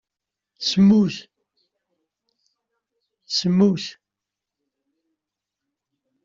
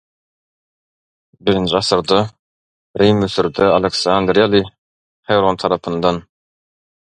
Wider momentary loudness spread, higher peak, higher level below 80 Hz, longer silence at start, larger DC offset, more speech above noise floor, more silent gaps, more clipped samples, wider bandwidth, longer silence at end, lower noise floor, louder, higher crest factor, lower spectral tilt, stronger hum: first, 15 LU vs 8 LU; second, -6 dBFS vs 0 dBFS; second, -62 dBFS vs -46 dBFS; second, 0.6 s vs 1.45 s; neither; second, 68 dB vs over 75 dB; second, none vs 2.39-2.94 s, 4.78-5.23 s; neither; second, 7.6 kHz vs 11 kHz; first, 2.35 s vs 0.8 s; second, -86 dBFS vs under -90 dBFS; second, -19 LUFS vs -16 LUFS; about the same, 18 dB vs 18 dB; about the same, -6 dB/octave vs -5.5 dB/octave; neither